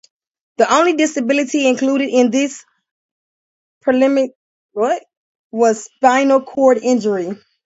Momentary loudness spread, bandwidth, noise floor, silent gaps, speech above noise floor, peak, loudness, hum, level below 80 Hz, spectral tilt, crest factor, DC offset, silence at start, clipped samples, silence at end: 10 LU; 8 kHz; under -90 dBFS; 2.91-3.81 s, 4.36-4.69 s, 5.17-5.50 s; over 75 dB; 0 dBFS; -16 LUFS; none; -68 dBFS; -4 dB/octave; 16 dB; under 0.1%; 0.6 s; under 0.1%; 0.3 s